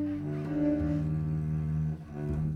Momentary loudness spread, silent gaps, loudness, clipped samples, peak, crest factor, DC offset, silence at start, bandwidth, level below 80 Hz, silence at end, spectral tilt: 6 LU; none; -32 LUFS; under 0.1%; -18 dBFS; 12 dB; under 0.1%; 0 s; 4.5 kHz; -44 dBFS; 0 s; -10.5 dB/octave